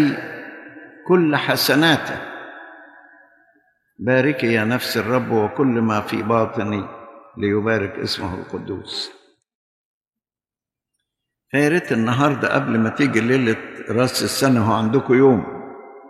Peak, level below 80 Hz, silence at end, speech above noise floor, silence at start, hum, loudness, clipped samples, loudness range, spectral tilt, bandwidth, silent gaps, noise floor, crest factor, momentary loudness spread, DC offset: -4 dBFS; -58 dBFS; 0 s; over 72 dB; 0 s; none; -19 LUFS; under 0.1%; 8 LU; -5.5 dB/octave; 14.5 kHz; 9.55-10.01 s; under -90 dBFS; 18 dB; 18 LU; under 0.1%